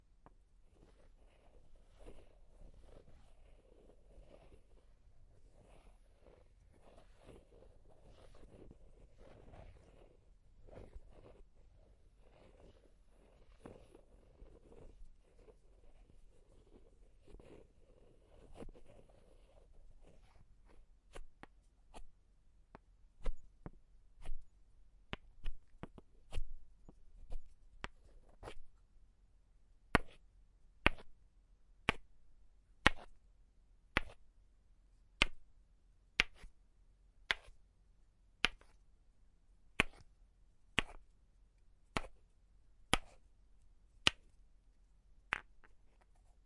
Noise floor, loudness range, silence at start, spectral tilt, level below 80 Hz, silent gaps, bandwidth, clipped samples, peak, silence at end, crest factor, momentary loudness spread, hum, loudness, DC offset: -68 dBFS; 24 LU; 0.8 s; -3 dB/octave; -54 dBFS; none; 11 kHz; under 0.1%; -4 dBFS; 0.7 s; 44 dB; 28 LU; none; -39 LUFS; under 0.1%